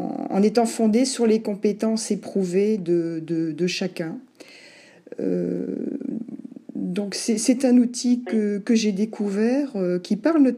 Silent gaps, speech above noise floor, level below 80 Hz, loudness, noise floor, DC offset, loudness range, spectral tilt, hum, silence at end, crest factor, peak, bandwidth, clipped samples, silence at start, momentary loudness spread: none; 27 dB; -76 dBFS; -23 LUFS; -49 dBFS; under 0.1%; 7 LU; -5.5 dB/octave; none; 0 s; 16 dB; -6 dBFS; 13 kHz; under 0.1%; 0 s; 11 LU